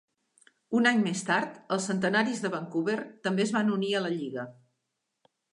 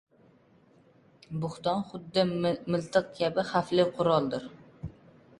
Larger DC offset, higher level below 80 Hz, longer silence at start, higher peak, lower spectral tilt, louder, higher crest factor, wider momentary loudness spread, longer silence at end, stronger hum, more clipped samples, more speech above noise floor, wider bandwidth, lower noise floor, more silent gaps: neither; second, -78 dBFS vs -62 dBFS; second, 0.7 s vs 1.3 s; about the same, -10 dBFS vs -10 dBFS; second, -4.5 dB/octave vs -6.5 dB/octave; about the same, -28 LUFS vs -29 LUFS; about the same, 18 dB vs 20 dB; second, 8 LU vs 19 LU; first, 1 s vs 0.5 s; neither; neither; first, 54 dB vs 33 dB; about the same, 11 kHz vs 11.5 kHz; first, -82 dBFS vs -61 dBFS; neither